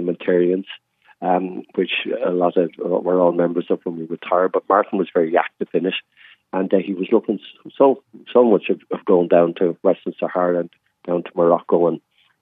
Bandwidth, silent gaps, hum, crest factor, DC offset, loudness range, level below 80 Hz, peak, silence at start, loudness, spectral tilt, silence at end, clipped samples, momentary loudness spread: 4 kHz; none; none; 18 dB; under 0.1%; 3 LU; -84 dBFS; -2 dBFS; 0 s; -19 LUFS; -10 dB/octave; 0.45 s; under 0.1%; 11 LU